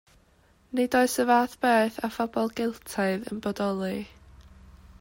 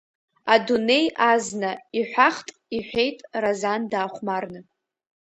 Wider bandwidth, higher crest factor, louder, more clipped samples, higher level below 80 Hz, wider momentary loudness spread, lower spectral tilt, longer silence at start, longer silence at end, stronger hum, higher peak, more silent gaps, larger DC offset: first, 16.5 kHz vs 8.8 kHz; about the same, 18 dB vs 22 dB; second, -26 LUFS vs -23 LUFS; neither; first, -58 dBFS vs -64 dBFS; about the same, 10 LU vs 12 LU; about the same, -4.5 dB/octave vs -3.5 dB/octave; first, 0.75 s vs 0.45 s; about the same, 0.6 s vs 0.6 s; neither; second, -10 dBFS vs -2 dBFS; neither; neither